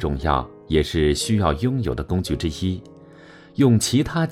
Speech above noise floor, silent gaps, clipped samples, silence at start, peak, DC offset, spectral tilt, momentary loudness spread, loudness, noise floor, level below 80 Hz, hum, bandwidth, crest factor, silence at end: 25 dB; none; under 0.1%; 0 s; -4 dBFS; under 0.1%; -5.5 dB/octave; 8 LU; -21 LUFS; -45 dBFS; -34 dBFS; none; 16 kHz; 18 dB; 0 s